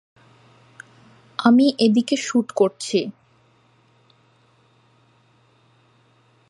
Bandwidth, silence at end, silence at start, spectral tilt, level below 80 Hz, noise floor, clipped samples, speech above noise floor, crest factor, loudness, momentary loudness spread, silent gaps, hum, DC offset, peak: 11.5 kHz; 3.4 s; 1.4 s; -5 dB/octave; -76 dBFS; -58 dBFS; under 0.1%; 40 dB; 22 dB; -19 LUFS; 9 LU; none; none; under 0.1%; -2 dBFS